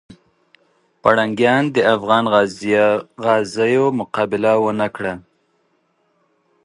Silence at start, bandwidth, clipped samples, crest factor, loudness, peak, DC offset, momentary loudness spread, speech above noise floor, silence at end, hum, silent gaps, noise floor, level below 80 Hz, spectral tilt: 0.1 s; 11.5 kHz; under 0.1%; 18 dB; -17 LUFS; 0 dBFS; under 0.1%; 6 LU; 47 dB; 1.45 s; none; none; -64 dBFS; -58 dBFS; -5.5 dB/octave